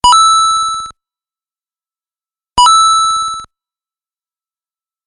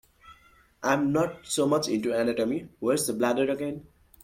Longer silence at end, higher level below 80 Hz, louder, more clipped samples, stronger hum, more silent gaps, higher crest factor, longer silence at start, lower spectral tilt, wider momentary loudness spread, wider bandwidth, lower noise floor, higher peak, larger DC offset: first, 1.6 s vs 0.4 s; first, -42 dBFS vs -62 dBFS; first, -9 LUFS vs -27 LUFS; neither; neither; neither; about the same, 14 dB vs 18 dB; second, 0.05 s vs 0.25 s; second, 1 dB/octave vs -4.5 dB/octave; first, 16 LU vs 7 LU; second, 11.5 kHz vs 16.5 kHz; first, under -90 dBFS vs -59 dBFS; first, 0 dBFS vs -10 dBFS; neither